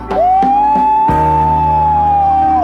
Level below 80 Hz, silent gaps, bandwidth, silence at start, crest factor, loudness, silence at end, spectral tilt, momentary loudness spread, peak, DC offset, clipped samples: -28 dBFS; none; 6.4 kHz; 0 s; 8 dB; -11 LUFS; 0 s; -8.5 dB/octave; 1 LU; -2 dBFS; under 0.1%; under 0.1%